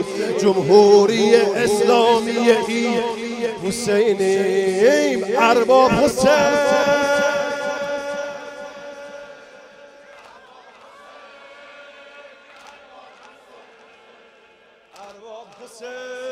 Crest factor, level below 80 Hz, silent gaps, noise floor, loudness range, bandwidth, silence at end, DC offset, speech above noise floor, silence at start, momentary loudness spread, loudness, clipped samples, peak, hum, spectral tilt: 18 dB; -54 dBFS; none; -52 dBFS; 18 LU; 15 kHz; 0 s; under 0.1%; 36 dB; 0 s; 21 LU; -17 LUFS; under 0.1%; -2 dBFS; none; -4 dB/octave